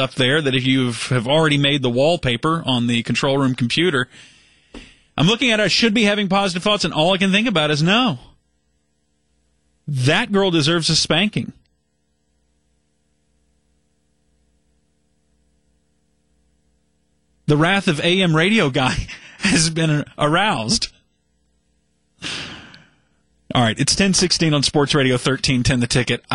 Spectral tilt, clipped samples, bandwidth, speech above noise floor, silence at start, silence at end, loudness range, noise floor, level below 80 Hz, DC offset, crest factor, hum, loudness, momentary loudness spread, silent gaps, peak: -4.5 dB/octave; under 0.1%; 11.5 kHz; 51 dB; 0 s; 0 s; 6 LU; -68 dBFS; -44 dBFS; under 0.1%; 16 dB; 60 Hz at -45 dBFS; -17 LUFS; 12 LU; none; -4 dBFS